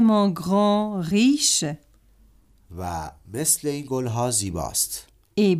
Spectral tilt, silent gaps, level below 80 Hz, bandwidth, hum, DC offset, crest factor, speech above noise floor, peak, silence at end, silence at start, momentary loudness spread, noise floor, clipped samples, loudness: -4 dB/octave; none; -50 dBFS; 15.5 kHz; none; under 0.1%; 16 dB; 33 dB; -6 dBFS; 0 s; 0 s; 15 LU; -56 dBFS; under 0.1%; -22 LUFS